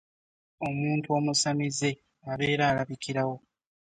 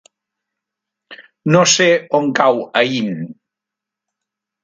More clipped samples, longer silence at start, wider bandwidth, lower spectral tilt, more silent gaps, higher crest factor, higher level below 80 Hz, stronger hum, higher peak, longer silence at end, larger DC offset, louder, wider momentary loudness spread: neither; second, 0.6 s vs 1.1 s; about the same, 9.4 kHz vs 9.8 kHz; about the same, -4.5 dB/octave vs -3.5 dB/octave; neither; about the same, 16 dB vs 18 dB; first, -62 dBFS vs -68 dBFS; neither; second, -14 dBFS vs 0 dBFS; second, 0.55 s vs 1.3 s; neither; second, -28 LUFS vs -14 LUFS; second, 11 LU vs 14 LU